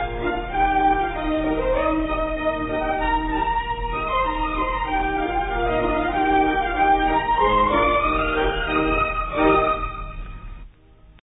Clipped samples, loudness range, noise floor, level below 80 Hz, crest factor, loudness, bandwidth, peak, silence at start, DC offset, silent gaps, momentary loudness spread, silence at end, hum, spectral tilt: under 0.1%; 4 LU; -49 dBFS; -32 dBFS; 16 dB; -21 LUFS; 4 kHz; -6 dBFS; 0 s; under 0.1%; none; 7 LU; 0.25 s; none; -10.5 dB/octave